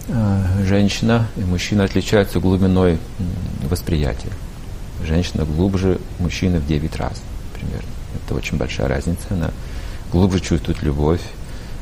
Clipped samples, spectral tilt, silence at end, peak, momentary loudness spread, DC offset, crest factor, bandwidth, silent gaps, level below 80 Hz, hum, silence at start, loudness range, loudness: under 0.1%; -6.5 dB/octave; 0 s; -2 dBFS; 15 LU; under 0.1%; 16 dB; 15.5 kHz; none; -28 dBFS; none; 0 s; 5 LU; -20 LUFS